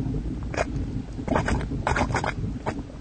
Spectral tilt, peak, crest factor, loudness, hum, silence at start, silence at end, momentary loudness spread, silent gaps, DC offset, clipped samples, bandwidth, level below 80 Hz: -6 dB/octave; -8 dBFS; 20 dB; -28 LUFS; none; 0 s; 0 s; 7 LU; none; under 0.1%; under 0.1%; 9.2 kHz; -34 dBFS